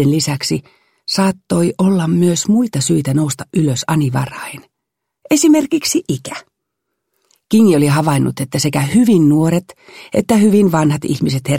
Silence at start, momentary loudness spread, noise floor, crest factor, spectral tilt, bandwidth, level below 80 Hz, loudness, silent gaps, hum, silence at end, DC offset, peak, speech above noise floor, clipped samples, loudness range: 0 s; 10 LU; -77 dBFS; 14 dB; -5.5 dB/octave; 16.5 kHz; -52 dBFS; -14 LUFS; none; none; 0 s; under 0.1%; 0 dBFS; 63 dB; under 0.1%; 4 LU